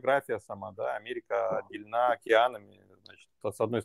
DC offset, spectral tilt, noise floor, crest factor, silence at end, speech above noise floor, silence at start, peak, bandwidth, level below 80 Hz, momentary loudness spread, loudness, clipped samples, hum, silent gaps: under 0.1%; -5 dB/octave; -57 dBFS; 22 dB; 0 s; 27 dB; 0.05 s; -10 dBFS; 15 kHz; -78 dBFS; 14 LU; -30 LUFS; under 0.1%; none; none